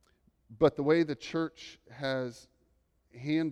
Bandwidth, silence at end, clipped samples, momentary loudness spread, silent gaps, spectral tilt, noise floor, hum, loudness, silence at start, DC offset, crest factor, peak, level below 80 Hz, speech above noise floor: 10.5 kHz; 0 s; under 0.1%; 15 LU; none; -6.5 dB/octave; -72 dBFS; none; -31 LUFS; 0.5 s; under 0.1%; 20 dB; -12 dBFS; -64 dBFS; 41 dB